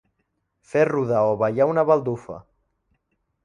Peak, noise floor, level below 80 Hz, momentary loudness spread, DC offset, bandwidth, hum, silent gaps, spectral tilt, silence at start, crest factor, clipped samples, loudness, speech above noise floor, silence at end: -4 dBFS; -74 dBFS; -62 dBFS; 14 LU; under 0.1%; 10 kHz; none; none; -8.5 dB/octave; 0.75 s; 18 dB; under 0.1%; -21 LUFS; 53 dB; 1.05 s